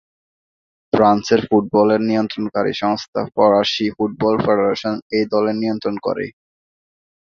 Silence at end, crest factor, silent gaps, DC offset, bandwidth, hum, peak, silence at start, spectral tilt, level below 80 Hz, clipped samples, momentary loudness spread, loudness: 0.95 s; 18 dB; 3.08-3.13 s, 5.02-5.10 s; under 0.1%; 7.2 kHz; none; 0 dBFS; 0.95 s; -6 dB/octave; -54 dBFS; under 0.1%; 8 LU; -18 LUFS